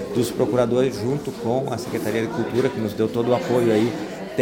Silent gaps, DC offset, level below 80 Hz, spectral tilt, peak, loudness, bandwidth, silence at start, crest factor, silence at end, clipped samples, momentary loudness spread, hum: none; under 0.1%; -54 dBFS; -6.5 dB/octave; -6 dBFS; -22 LUFS; 17 kHz; 0 s; 16 dB; 0 s; under 0.1%; 7 LU; none